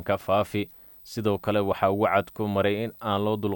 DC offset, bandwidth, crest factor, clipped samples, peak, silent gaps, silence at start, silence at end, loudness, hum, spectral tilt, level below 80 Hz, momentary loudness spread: under 0.1%; 17.5 kHz; 18 dB; under 0.1%; -8 dBFS; none; 0 s; 0 s; -26 LUFS; none; -7 dB/octave; -58 dBFS; 8 LU